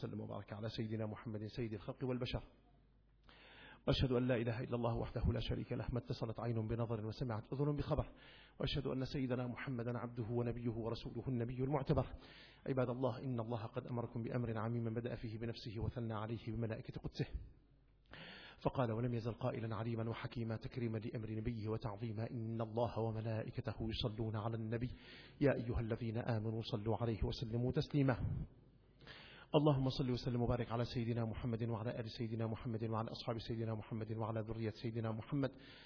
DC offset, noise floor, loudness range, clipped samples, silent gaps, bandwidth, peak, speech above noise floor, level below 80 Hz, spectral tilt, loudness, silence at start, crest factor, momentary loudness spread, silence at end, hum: under 0.1%; -70 dBFS; 5 LU; under 0.1%; none; 5.4 kHz; -20 dBFS; 29 dB; -56 dBFS; -6.5 dB/octave; -42 LUFS; 0 s; 22 dB; 9 LU; 0 s; none